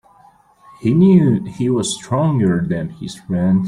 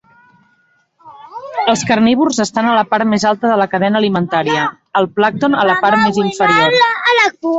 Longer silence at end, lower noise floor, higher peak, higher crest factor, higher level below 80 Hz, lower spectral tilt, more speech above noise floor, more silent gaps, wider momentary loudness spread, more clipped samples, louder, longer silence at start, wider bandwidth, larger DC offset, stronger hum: about the same, 0 s vs 0 s; second, -50 dBFS vs -57 dBFS; about the same, -2 dBFS vs 0 dBFS; about the same, 14 dB vs 14 dB; about the same, -50 dBFS vs -54 dBFS; first, -7 dB/octave vs -4.5 dB/octave; second, 34 dB vs 44 dB; neither; first, 12 LU vs 6 LU; neither; second, -16 LUFS vs -13 LUFS; second, 0.8 s vs 1.05 s; first, 11 kHz vs 8.2 kHz; neither; neither